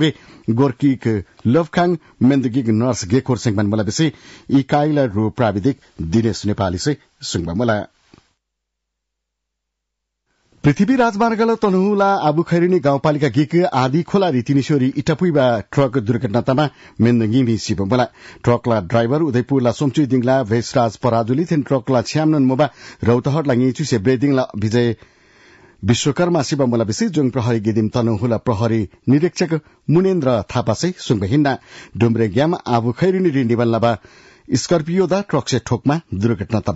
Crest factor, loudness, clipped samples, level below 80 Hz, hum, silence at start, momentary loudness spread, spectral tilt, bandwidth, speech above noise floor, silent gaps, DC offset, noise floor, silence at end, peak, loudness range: 12 dB; -18 LUFS; under 0.1%; -50 dBFS; none; 0 s; 5 LU; -6.5 dB/octave; 8 kHz; 61 dB; none; under 0.1%; -78 dBFS; 0 s; -4 dBFS; 4 LU